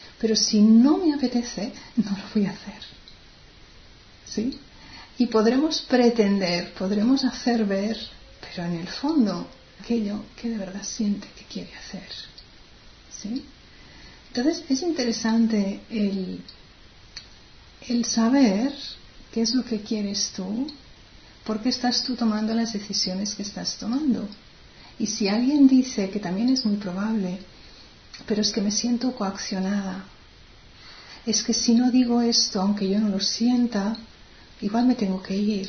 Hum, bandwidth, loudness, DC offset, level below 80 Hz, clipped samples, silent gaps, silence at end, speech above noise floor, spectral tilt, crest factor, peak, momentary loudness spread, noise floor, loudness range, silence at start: none; 6.6 kHz; -24 LUFS; under 0.1%; -54 dBFS; under 0.1%; none; 0 s; 26 dB; -4.5 dB/octave; 18 dB; -6 dBFS; 18 LU; -49 dBFS; 9 LU; 0 s